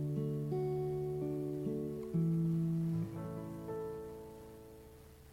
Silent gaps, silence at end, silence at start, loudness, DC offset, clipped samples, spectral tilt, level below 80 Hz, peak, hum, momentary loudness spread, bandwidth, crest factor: none; 0 s; 0 s; -38 LUFS; under 0.1%; under 0.1%; -9.5 dB/octave; -62 dBFS; -26 dBFS; none; 19 LU; 15.5 kHz; 12 dB